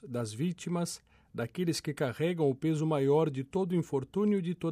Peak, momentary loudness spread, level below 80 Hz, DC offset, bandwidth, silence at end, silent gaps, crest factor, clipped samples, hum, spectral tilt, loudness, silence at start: -16 dBFS; 10 LU; -68 dBFS; under 0.1%; 15 kHz; 0 s; none; 16 dB; under 0.1%; none; -6.5 dB/octave; -32 LUFS; 0.05 s